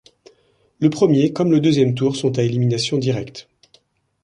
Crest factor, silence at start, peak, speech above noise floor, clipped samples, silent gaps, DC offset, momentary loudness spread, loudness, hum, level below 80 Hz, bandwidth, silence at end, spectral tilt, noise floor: 16 dB; 0.8 s; -2 dBFS; 42 dB; under 0.1%; none; under 0.1%; 8 LU; -18 LUFS; none; -58 dBFS; 10.5 kHz; 0.85 s; -6.5 dB/octave; -59 dBFS